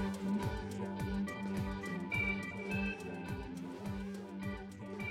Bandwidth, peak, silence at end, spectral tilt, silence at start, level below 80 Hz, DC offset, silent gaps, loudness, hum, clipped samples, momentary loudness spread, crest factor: 15.5 kHz; -24 dBFS; 0 s; -6.5 dB/octave; 0 s; -52 dBFS; under 0.1%; none; -40 LUFS; none; under 0.1%; 8 LU; 14 dB